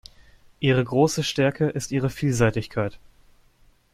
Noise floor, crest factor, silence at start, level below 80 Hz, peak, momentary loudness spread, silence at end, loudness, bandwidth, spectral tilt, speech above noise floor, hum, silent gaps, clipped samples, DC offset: -58 dBFS; 18 dB; 0.6 s; -50 dBFS; -6 dBFS; 7 LU; 0.95 s; -23 LUFS; 15.5 kHz; -5.5 dB/octave; 35 dB; none; none; under 0.1%; under 0.1%